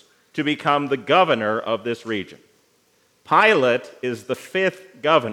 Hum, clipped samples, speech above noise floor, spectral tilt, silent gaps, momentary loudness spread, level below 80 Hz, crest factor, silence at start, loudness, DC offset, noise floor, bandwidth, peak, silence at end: none; under 0.1%; 41 dB; -5 dB/octave; none; 13 LU; -78 dBFS; 20 dB; 0.35 s; -20 LUFS; under 0.1%; -62 dBFS; 16 kHz; 0 dBFS; 0 s